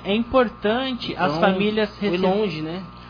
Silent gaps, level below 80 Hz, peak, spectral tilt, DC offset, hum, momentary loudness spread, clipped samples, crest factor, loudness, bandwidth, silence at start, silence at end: none; -46 dBFS; -6 dBFS; -7.5 dB/octave; under 0.1%; none; 7 LU; under 0.1%; 16 dB; -22 LUFS; 5.2 kHz; 0 s; 0 s